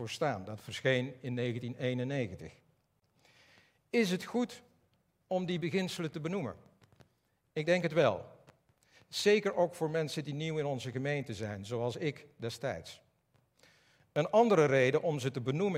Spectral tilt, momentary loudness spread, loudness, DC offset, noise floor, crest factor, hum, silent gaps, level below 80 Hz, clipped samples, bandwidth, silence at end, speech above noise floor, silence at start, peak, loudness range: -5.5 dB/octave; 14 LU; -33 LUFS; under 0.1%; -75 dBFS; 22 dB; none; none; -76 dBFS; under 0.1%; 16 kHz; 0 s; 43 dB; 0 s; -14 dBFS; 6 LU